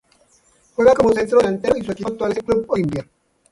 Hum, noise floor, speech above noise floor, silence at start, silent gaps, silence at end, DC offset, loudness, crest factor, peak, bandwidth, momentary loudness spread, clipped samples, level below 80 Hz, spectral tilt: none; -57 dBFS; 40 dB; 0.8 s; none; 0.5 s; under 0.1%; -18 LUFS; 18 dB; -2 dBFS; 11.5 kHz; 11 LU; under 0.1%; -48 dBFS; -6.5 dB/octave